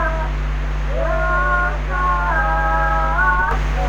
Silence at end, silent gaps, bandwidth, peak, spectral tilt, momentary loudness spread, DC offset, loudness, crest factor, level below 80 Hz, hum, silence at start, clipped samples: 0 s; none; 7.2 kHz; -4 dBFS; -6.5 dB/octave; 7 LU; under 0.1%; -19 LUFS; 14 dB; -20 dBFS; none; 0 s; under 0.1%